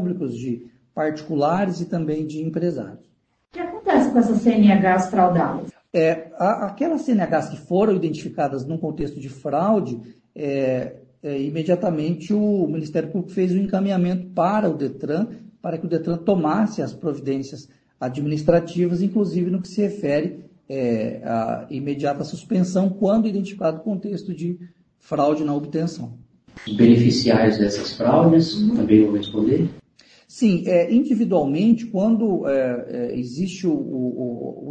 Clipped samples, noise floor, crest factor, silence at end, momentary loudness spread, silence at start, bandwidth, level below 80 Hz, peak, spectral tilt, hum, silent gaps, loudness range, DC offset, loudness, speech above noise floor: under 0.1%; -54 dBFS; 20 dB; 0 s; 13 LU; 0 s; 8.8 kHz; -56 dBFS; 0 dBFS; -7.5 dB/octave; none; none; 6 LU; under 0.1%; -21 LUFS; 34 dB